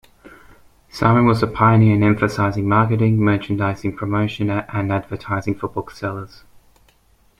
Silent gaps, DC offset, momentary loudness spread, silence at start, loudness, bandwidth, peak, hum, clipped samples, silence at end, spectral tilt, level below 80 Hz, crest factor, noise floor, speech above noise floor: none; under 0.1%; 13 LU; 0.25 s; -18 LUFS; 10.5 kHz; -2 dBFS; none; under 0.1%; 1.15 s; -8 dB/octave; -46 dBFS; 18 dB; -56 dBFS; 39 dB